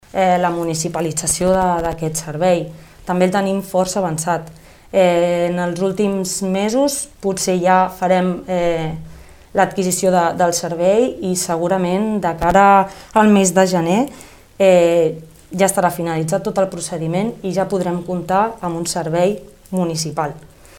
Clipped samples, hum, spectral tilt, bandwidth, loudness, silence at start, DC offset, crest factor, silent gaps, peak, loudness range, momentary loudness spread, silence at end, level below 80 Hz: under 0.1%; none; -5 dB/octave; 17 kHz; -17 LUFS; 0.15 s; under 0.1%; 16 dB; none; 0 dBFS; 5 LU; 10 LU; 0.35 s; -44 dBFS